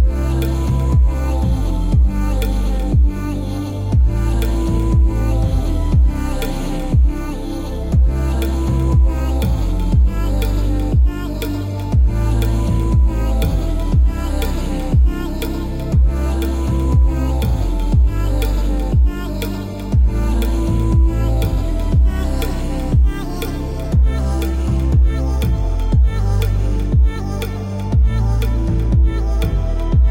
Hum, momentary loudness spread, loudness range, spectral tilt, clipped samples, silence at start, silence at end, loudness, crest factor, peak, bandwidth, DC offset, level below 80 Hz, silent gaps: none; 7 LU; 1 LU; -7.5 dB/octave; under 0.1%; 0 s; 0 s; -18 LUFS; 10 dB; -4 dBFS; 16.5 kHz; under 0.1%; -16 dBFS; none